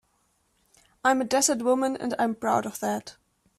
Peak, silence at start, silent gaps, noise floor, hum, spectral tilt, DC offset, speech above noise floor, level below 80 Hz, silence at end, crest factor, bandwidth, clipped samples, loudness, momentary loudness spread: -8 dBFS; 1.05 s; none; -70 dBFS; none; -3 dB/octave; under 0.1%; 44 dB; -68 dBFS; 0.45 s; 20 dB; 15 kHz; under 0.1%; -25 LUFS; 8 LU